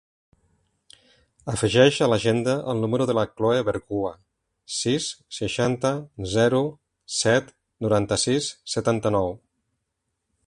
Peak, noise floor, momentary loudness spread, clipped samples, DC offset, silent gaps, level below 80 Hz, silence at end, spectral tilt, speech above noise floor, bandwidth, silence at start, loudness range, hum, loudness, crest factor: -2 dBFS; -79 dBFS; 11 LU; under 0.1%; under 0.1%; none; -52 dBFS; 1.1 s; -4.5 dB/octave; 56 dB; 11.5 kHz; 1.45 s; 3 LU; none; -23 LUFS; 22 dB